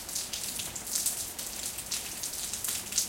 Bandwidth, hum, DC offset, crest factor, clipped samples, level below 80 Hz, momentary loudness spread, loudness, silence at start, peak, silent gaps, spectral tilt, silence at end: 17 kHz; none; under 0.1%; 24 dB; under 0.1%; -58 dBFS; 5 LU; -32 LUFS; 0 s; -12 dBFS; none; 0 dB/octave; 0 s